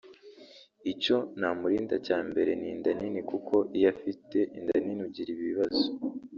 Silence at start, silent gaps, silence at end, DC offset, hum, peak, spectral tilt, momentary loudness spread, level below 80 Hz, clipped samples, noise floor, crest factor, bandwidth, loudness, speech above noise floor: 0.05 s; none; 0 s; under 0.1%; none; -12 dBFS; -3.5 dB/octave; 8 LU; -68 dBFS; under 0.1%; -54 dBFS; 18 dB; 7.2 kHz; -30 LUFS; 25 dB